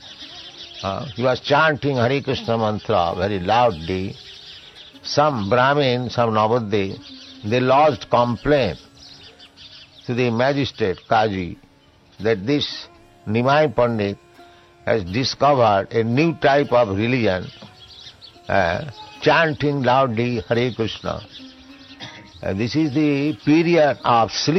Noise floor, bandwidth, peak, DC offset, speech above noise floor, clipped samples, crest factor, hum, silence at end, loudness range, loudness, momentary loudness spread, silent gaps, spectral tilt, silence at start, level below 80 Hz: -53 dBFS; 7.8 kHz; -4 dBFS; under 0.1%; 34 dB; under 0.1%; 18 dB; none; 0 s; 4 LU; -19 LUFS; 20 LU; none; -6 dB/octave; 0 s; -50 dBFS